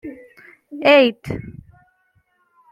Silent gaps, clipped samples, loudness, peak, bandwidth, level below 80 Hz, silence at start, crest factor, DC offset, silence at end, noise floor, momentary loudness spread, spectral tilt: none; under 0.1%; -16 LUFS; -2 dBFS; 13.5 kHz; -52 dBFS; 0.05 s; 20 dB; under 0.1%; 1.2 s; -63 dBFS; 25 LU; -6 dB/octave